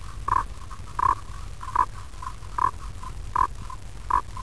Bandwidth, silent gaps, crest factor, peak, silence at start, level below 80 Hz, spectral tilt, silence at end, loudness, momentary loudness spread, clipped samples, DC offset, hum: 11 kHz; none; 20 dB; -8 dBFS; 0 s; -38 dBFS; -4.5 dB/octave; 0 s; -28 LUFS; 15 LU; under 0.1%; 1%; none